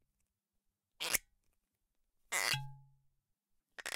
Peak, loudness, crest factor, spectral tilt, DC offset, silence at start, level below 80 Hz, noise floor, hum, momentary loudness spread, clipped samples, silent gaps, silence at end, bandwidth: -12 dBFS; -37 LUFS; 32 dB; -0.5 dB/octave; under 0.1%; 1 s; -70 dBFS; -86 dBFS; none; 18 LU; under 0.1%; none; 0 s; 17 kHz